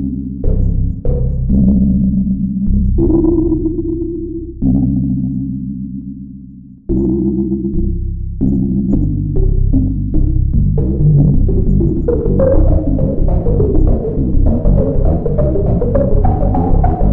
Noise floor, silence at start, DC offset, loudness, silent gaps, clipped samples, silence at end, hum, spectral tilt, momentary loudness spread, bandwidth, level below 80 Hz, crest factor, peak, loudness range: -34 dBFS; 0 s; under 0.1%; -15 LUFS; none; under 0.1%; 0 s; none; -14.5 dB/octave; 9 LU; 1.9 kHz; -16 dBFS; 10 dB; -4 dBFS; 5 LU